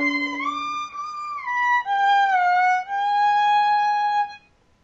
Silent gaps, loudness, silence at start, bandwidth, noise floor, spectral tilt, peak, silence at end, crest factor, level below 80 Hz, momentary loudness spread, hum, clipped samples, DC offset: none; -21 LUFS; 0 s; 7.6 kHz; -50 dBFS; -2 dB/octave; -10 dBFS; 0.45 s; 10 dB; -66 dBFS; 11 LU; none; under 0.1%; under 0.1%